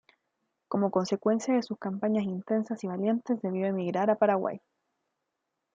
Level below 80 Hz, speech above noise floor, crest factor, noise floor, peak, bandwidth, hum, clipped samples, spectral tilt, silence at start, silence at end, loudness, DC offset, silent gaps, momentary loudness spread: -78 dBFS; 55 dB; 20 dB; -83 dBFS; -10 dBFS; 7.6 kHz; none; under 0.1%; -7 dB/octave; 0.7 s; 1.15 s; -29 LUFS; under 0.1%; none; 8 LU